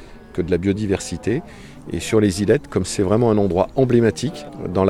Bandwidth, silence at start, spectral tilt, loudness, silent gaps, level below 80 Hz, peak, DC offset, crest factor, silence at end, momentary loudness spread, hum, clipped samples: 14 kHz; 0 s; -6.5 dB/octave; -20 LUFS; none; -44 dBFS; -2 dBFS; under 0.1%; 18 dB; 0 s; 13 LU; none; under 0.1%